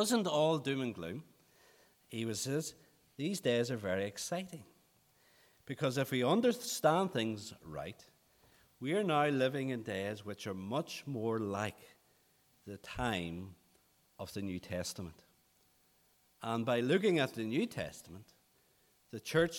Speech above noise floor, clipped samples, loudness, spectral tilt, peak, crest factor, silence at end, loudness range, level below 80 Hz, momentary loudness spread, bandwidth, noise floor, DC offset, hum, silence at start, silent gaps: 36 dB; under 0.1%; -36 LUFS; -5 dB/octave; -16 dBFS; 22 dB; 0 s; 8 LU; -68 dBFS; 18 LU; 19 kHz; -71 dBFS; under 0.1%; none; 0 s; none